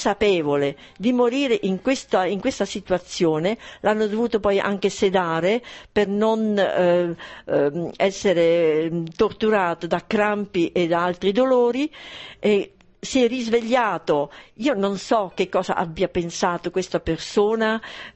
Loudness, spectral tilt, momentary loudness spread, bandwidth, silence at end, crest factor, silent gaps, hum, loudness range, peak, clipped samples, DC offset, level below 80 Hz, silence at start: -22 LUFS; -5 dB/octave; 7 LU; 8.4 kHz; 0.05 s; 14 dB; none; none; 2 LU; -6 dBFS; under 0.1%; under 0.1%; -52 dBFS; 0 s